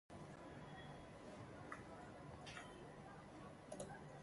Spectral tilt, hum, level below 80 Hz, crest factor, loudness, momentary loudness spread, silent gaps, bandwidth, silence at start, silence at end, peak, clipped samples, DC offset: -5 dB/octave; none; -72 dBFS; 20 dB; -56 LUFS; 4 LU; none; 11.5 kHz; 0.1 s; 0 s; -36 dBFS; under 0.1%; under 0.1%